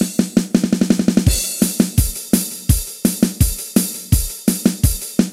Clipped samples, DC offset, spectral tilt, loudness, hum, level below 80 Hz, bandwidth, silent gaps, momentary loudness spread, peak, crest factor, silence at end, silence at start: under 0.1%; under 0.1%; -5 dB/octave; -17 LUFS; none; -26 dBFS; 16.5 kHz; none; 3 LU; 0 dBFS; 16 dB; 0 s; 0 s